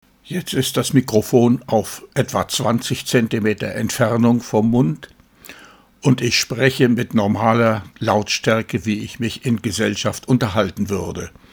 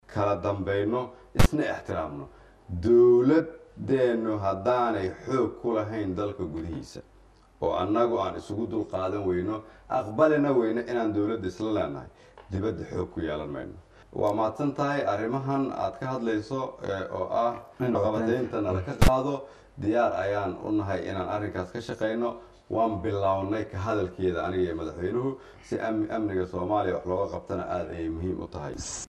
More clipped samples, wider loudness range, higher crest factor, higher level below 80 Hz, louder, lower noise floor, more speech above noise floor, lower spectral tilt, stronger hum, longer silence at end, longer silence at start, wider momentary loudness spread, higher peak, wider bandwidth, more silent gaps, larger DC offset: neither; second, 2 LU vs 6 LU; about the same, 18 dB vs 18 dB; second, -50 dBFS vs -42 dBFS; first, -19 LUFS vs -28 LUFS; second, -46 dBFS vs -56 dBFS; about the same, 28 dB vs 29 dB; second, -5 dB/octave vs -7 dB/octave; neither; first, 0.25 s vs 0.05 s; first, 0.25 s vs 0.1 s; second, 8 LU vs 11 LU; first, 0 dBFS vs -8 dBFS; first, over 20 kHz vs 13 kHz; neither; neither